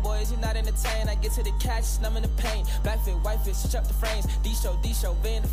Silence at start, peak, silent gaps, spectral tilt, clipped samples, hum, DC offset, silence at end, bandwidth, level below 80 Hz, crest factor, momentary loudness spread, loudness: 0 s; -16 dBFS; none; -4.5 dB/octave; under 0.1%; 50 Hz at -25 dBFS; under 0.1%; 0 s; 16 kHz; -24 dBFS; 8 dB; 1 LU; -28 LUFS